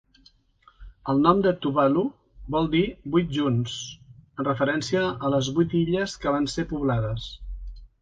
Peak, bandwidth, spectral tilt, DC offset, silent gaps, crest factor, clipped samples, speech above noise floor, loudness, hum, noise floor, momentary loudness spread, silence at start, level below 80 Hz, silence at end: -6 dBFS; 9.4 kHz; -6 dB/octave; under 0.1%; none; 20 dB; under 0.1%; 36 dB; -25 LUFS; none; -59 dBFS; 16 LU; 0.8 s; -44 dBFS; 0.15 s